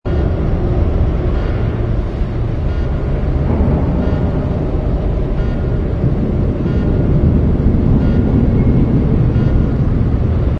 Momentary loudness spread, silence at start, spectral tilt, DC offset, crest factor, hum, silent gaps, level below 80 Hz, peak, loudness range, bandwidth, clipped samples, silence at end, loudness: 5 LU; 0.05 s; -10.5 dB/octave; under 0.1%; 12 dB; none; none; -18 dBFS; 0 dBFS; 4 LU; 5.8 kHz; under 0.1%; 0 s; -16 LUFS